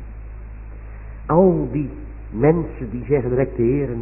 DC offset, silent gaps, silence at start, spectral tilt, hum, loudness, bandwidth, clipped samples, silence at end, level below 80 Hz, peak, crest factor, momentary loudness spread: under 0.1%; none; 0 s; -15 dB/octave; none; -20 LUFS; 2.9 kHz; under 0.1%; 0 s; -34 dBFS; -2 dBFS; 18 dB; 21 LU